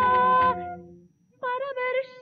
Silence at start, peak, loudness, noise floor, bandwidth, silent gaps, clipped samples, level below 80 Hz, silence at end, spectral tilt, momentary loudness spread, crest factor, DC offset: 0 s; -12 dBFS; -25 LUFS; -55 dBFS; 4.9 kHz; none; under 0.1%; -60 dBFS; 0 s; -2.5 dB/octave; 17 LU; 12 dB; under 0.1%